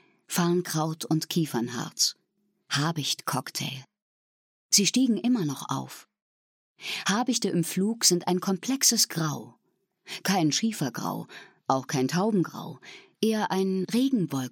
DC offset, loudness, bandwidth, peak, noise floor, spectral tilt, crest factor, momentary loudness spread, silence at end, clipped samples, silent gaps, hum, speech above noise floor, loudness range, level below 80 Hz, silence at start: under 0.1%; -26 LUFS; 17.5 kHz; -6 dBFS; -74 dBFS; -3.5 dB/octave; 22 dB; 13 LU; 0 s; under 0.1%; 4.02-4.69 s, 6.22-6.75 s; none; 47 dB; 4 LU; -80 dBFS; 0.3 s